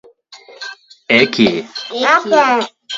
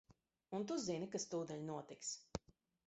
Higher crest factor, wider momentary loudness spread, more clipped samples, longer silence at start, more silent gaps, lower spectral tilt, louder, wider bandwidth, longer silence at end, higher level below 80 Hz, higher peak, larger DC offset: about the same, 16 dB vs 20 dB; first, 19 LU vs 7 LU; neither; first, 0.3 s vs 0.1 s; neither; about the same, -4 dB/octave vs -4.5 dB/octave; first, -13 LUFS vs -46 LUFS; about the same, 7.8 kHz vs 8.2 kHz; second, 0 s vs 0.5 s; first, -58 dBFS vs -70 dBFS; first, 0 dBFS vs -26 dBFS; neither